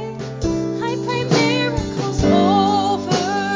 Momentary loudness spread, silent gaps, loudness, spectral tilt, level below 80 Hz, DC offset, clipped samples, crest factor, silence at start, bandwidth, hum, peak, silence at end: 8 LU; none; -18 LUFS; -5.5 dB/octave; -36 dBFS; under 0.1%; under 0.1%; 16 dB; 0 s; 7.6 kHz; none; -2 dBFS; 0 s